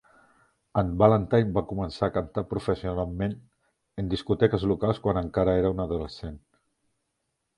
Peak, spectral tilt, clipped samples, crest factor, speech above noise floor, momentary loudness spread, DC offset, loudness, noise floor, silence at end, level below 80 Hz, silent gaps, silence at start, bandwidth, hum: -4 dBFS; -8.5 dB/octave; under 0.1%; 22 dB; 53 dB; 12 LU; under 0.1%; -26 LUFS; -79 dBFS; 1.2 s; -44 dBFS; none; 0.75 s; 10.5 kHz; none